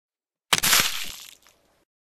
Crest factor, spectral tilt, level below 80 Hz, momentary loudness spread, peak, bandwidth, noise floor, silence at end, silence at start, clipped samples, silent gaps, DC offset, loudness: 26 dB; 0.5 dB/octave; -54 dBFS; 18 LU; 0 dBFS; 16.5 kHz; -60 dBFS; 0.25 s; 0.05 s; under 0.1%; none; under 0.1%; -20 LUFS